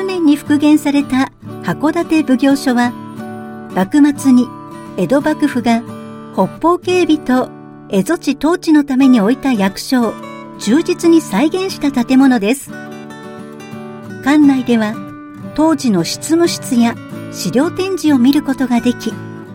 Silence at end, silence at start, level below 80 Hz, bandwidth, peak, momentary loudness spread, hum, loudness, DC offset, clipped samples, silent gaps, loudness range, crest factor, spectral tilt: 0 s; 0 s; -48 dBFS; 16.5 kHz; 0 dBFS; 18 LU; none; -14 LUFS; under 0.1%; under 0.1%; none; 2 LU; 14 dB; -5.5 dB/octave